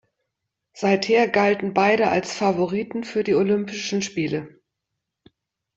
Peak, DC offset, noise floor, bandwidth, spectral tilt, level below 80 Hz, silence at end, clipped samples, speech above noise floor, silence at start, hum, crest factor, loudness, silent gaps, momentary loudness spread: -4 dBFS; under 0.1%; -81 dBFS; 8 kHz; -5 dB/octave; -64 dBFS; 1.3 s; under 0.1%; 60 dB; 0.75 s; none; 18 dB; -21 LUFS; none; 8 LU